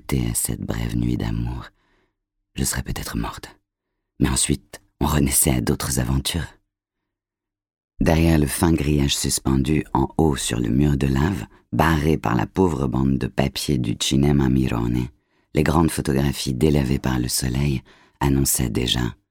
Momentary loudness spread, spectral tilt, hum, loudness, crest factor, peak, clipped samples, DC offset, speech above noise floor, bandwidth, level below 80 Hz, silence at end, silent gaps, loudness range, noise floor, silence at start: 9 LU; -5 dB/octave; none; -21 LUFS; 18 dB; -2 dBFS; under 0.1%; under 0.1%; 67 dB; 18 kHz; -32 dBFS; 0.15 s; 7.84-7.88 s; 6 LU; -88 dBFS; 0.1 s